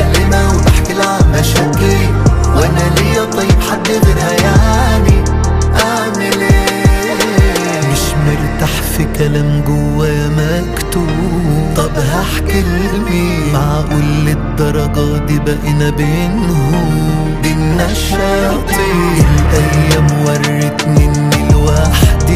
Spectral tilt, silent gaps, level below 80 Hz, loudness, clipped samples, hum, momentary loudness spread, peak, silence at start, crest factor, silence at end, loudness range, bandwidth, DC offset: -5.5 dB/octave; none; -16 dBFS; -12 LUFS; under 0.1%; none; 4 LU; 0 dBFS; 0 s; 10 dB; 0 s; 3 LU; 16 kHz; under 0.1%